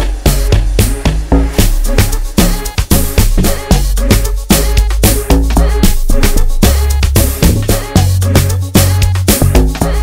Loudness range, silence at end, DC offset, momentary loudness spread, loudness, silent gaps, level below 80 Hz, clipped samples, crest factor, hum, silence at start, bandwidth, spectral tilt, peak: 2 LU; 0 s; under 0.1%; 3 LU; -12 LUFS; none; -12 dBFS; 0.3%; 10 dB; none; 0 s; 16.5 kHz; -5 dB/octave; 0 dBFS